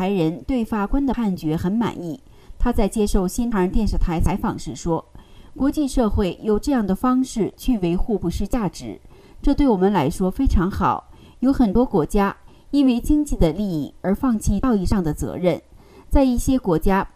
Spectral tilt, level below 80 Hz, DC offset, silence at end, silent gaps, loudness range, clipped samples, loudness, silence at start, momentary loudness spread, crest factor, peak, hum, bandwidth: -7 dB/octave; -28 dBFS; under 0.1%; 0.1 s; none; 3 LU; under 0.1%; -21 LUFS; 0 s; 7 LU; 18 dB; -2 dBFS; none; 15.5 kHz